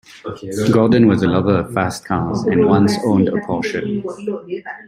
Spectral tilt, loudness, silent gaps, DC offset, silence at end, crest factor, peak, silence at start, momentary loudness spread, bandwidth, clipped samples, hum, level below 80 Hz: -7 dB/octave; -17 LUFS; none; under 0.1%; 0.05 s; 14 dB; -2 dBFS; 0.25 s; 14 LU; 15 kHz; under 0.1%; none; -48 dBFS